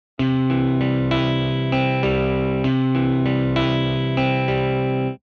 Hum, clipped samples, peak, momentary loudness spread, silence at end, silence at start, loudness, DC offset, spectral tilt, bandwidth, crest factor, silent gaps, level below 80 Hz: none; under 0.1%; -6 dBFS; 2 LU; 0.1 s; 0.2 s; -20 LUFS; under 0.1%; -8.5 dB/octave; 6.4 kHz; 14 dB; none; -40 dBFS